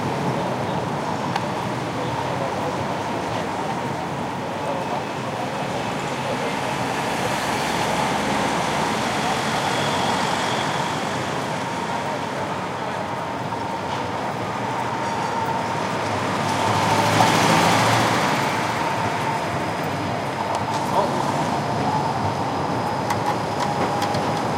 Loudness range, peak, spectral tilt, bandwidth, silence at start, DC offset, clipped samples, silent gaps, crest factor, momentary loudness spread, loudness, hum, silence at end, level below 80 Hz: 7 LU; -2 dBFS; -4.5 dB/octave; 16 kHz; 0 s; under 0.1%; under 0.1%; none; 20 dB; 7 LU; -23 LUFS; none; 0 s; -52 dBFS